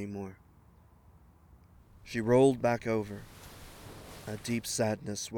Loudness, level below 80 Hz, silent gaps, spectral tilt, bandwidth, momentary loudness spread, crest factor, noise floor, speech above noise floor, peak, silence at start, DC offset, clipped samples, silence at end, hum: -31 LUFS; -58 dBFS; none; -5 dB/octave; 20 kHz; 24 LU; 20 dB; -60 dBFS; 29 dB; -12 dBFS; 0 s; under 0.1%; under 0.1%; 0 s; none